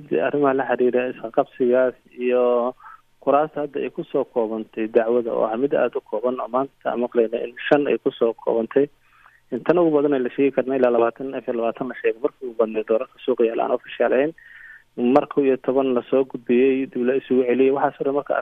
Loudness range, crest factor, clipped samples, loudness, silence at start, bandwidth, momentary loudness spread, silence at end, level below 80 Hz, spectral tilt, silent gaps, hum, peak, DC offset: 3 LU; 18 dB; under 0.1%; -21 LUFS; 0 s; 4.2 kHz; 8 LU; 0 s; -66 dBFS; -8.5 dB/octave; none; none; -4 dBFS; under 0.1%